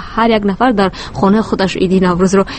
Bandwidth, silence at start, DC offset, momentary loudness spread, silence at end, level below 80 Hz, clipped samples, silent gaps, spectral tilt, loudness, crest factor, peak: 8.8 kHz; 0 s; under 0.1%; 4 LU; 0 s; -34 dBFS; under 0.1%; none; -6 dB/octave; -13 LUFS; 12 dB; 0 dBFS